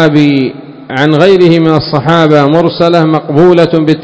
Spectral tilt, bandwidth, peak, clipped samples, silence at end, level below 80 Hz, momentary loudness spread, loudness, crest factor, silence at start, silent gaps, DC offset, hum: -7.5 dB/octave; 8 kHz; 0 dBFS; 6%; 0 s; -44 dBFS; 7 LU; -7 LUFS; 6 dB; 0 s; none; under 0.1%; none